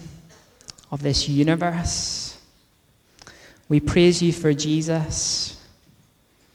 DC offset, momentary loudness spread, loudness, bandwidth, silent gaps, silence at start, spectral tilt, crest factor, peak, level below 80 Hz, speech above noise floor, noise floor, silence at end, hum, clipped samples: under 0.1%; 17 LU; -21 LUFS; 13 kHz; none; 0 s; -4.5 dB/octave; 18 dB; -6 dBFS; -42 dBFS; 40 dB; -60 dBFS; 0.95 s; none; under 0.1%